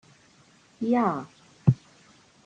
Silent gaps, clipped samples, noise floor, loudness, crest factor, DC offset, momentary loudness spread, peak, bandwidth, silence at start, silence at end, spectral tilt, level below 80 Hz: none; under 0.1%; -58 dBFS; -27 LUFS; 24 dB; under 0.1%; 11 LU; -6 dBFS; 8.4 kHz; 0.8 s; 0.7 s; -9 dB/octave; -62 dBFS